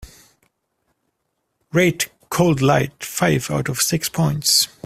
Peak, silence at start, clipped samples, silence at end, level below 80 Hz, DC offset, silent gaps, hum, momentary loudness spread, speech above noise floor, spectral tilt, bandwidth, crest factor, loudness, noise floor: -2 dBFS; 0 s; under 0.1%; 0.2 s; -50 dBFS; under 0.1%; none; none; 8 LU; 55 dB; -4 dB/octave; 16 kHz; 20 dB; -19 LUFS; -74 dBFS